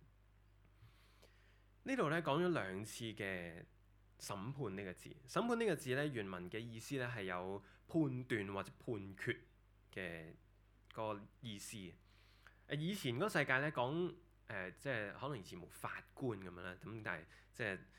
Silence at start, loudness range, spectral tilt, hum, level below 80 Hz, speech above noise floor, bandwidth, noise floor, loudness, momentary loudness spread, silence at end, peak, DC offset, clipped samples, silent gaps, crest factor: 0 s; 7 LU; -5.5 dB/octave; none; -70 dBFS; 26 dB; 18 kHz; -69 dBFS; -43 LUFS; 14 LU; 0 s; -20 dBFS; under 0.1%; under 0.1%; none; 24 dB